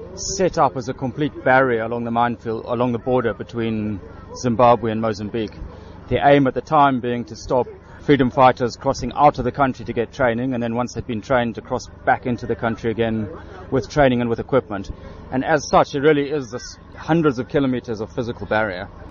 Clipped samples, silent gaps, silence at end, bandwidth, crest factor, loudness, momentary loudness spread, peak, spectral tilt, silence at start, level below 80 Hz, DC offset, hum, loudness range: under 0.1%; none; 0 s; 7.4 kHz; 18 dB; -20 LUFS; 13 LU; -2 dBFS; -5 dB/octave; 0 s; -42 dBFS; under 0.1%; none; 4 LU